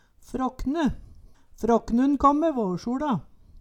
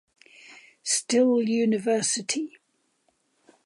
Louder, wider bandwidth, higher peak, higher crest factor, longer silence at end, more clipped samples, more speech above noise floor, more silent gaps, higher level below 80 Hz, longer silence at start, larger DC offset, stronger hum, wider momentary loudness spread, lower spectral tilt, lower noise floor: about the same, -25 LUFS vs -24 LUFS; about the same, 12.5 kHz vs 11.5 kHz; first, -8 dBFS vs -12 dBFS; about the same, 18 dB vs 16 dB; second, 0 s vs 1.15 s; neither; second, 25 dB vs 47 dB; neither; first, -44 dBFS vs -80 dBFS; second, 0.3 s vs 0.5 s; neither; neither; about the same, 11 LU vs 10 LU; first, -7 dB/octave vs -3 dB/octave; second, -49 dBFS vs -71 dBFS